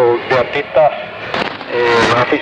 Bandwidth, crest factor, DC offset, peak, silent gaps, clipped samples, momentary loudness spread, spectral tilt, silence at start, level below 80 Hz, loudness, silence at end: 10 kHz; 14 dB; under 0.1%; 0 dBFS; none; under 0.1%; 8 LU; -5 dB/octave; 0 s; -46 dBFS; -14 LUFS; 0 s